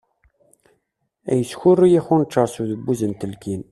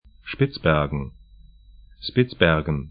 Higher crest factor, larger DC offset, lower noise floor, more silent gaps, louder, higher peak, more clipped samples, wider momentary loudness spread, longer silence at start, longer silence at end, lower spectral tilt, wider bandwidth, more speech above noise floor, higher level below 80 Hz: second, 16 dB vs 22 dB; neither; first, -72 dBFS vs -49 dBFS; neither; first, -19 LUFS vs -22 LUFS; about the same, -4 dBFS vs -2 dBFS; neither; about the same, 14 LU vs 15 LU; first, 1.25 s vs 0.25 s; about the same, 0.1 s vs 0 s; second, -7.5 dB/octave vs -11 dB/octave; first, 12 kHz vs 5 kHz; first, 53 dB vs 27 dB; second, -58 dBFS vs -40 dBFS